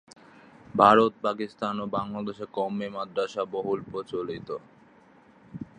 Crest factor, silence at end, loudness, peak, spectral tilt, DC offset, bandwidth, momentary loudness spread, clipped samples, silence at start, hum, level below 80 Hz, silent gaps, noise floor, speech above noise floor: 26 dB; 0.15 s; -27 LUFS; -2 dBFS; -6.5 dB/octave; under 0.1%; 9.8 kHz; 17 LU; under 0.1%; 0.75 s; none; -64 dBFS; none; -56 dBFS; 30 dB